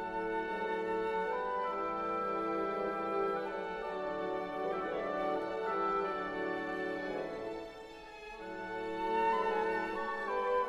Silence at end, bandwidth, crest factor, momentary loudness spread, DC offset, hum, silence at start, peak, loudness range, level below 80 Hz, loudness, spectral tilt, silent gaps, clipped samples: 0 s; 12 kHz; 14 dB; 9 LU; under 0.1%; none; 0 s; -22 dBFS; 3 LU; -64 dBFS; -36 LUFS; -6 dB/octave; none; under 0.1%